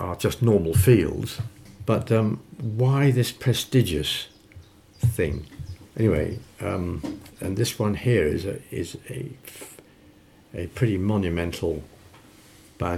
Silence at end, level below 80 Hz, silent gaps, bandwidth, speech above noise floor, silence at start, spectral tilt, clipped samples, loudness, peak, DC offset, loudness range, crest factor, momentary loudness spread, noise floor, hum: 0 s; -44 dBFS; none; 16 kHz; 29 dB; 0 s; -6 dB/octave; under 0.1%; -24 LUFS; -4 dBFS; under 0.1%; 7 LU; 20 dB; 16 LU; -53 dBFS; none